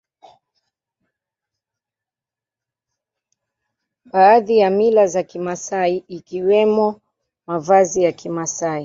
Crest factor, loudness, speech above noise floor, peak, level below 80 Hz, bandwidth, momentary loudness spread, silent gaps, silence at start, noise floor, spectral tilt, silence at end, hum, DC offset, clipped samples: 18 dB; -17 LUFS; 73 dB; -2 dBFS; -64 dBFS; 7.8 kHz; 13 LU; none; 4.15 s; -89 dBFS; -5 dB/octave; 0 s; none; under 0.1%; under 0.1%